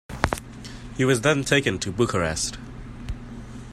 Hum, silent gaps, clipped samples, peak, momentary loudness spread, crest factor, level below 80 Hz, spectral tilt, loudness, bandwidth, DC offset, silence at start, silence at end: none; none; under 0.1%; 0 dBFS; 19 LU; 24 dB; -40 dBFS; -4.5 dB/octave; -23 LUFS; 15.5 kHz; under 0.1%; 0.1 s; 0 s